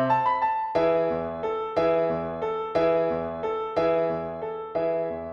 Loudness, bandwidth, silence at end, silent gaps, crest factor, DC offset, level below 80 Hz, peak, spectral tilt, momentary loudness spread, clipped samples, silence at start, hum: -26 LUFS; 6.6 kHz; 0 s; none; 14 dB; under 0.1%; -56 dBFS; -10 dBFS; -8 dB/octave; 7 LU; under 0.1%; 0 s; none